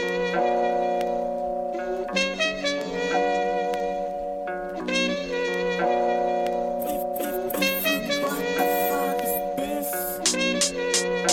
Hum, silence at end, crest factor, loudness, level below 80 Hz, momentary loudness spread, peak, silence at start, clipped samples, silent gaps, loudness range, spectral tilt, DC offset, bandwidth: none; 0 s; 18 dB; -25 LUFS; -52 dBFS; 6 LU; -6 dBFS; 0 s; under 0.1%; none; 2 LU; -2.5 dB/octave; under 0.1%; 17 kHz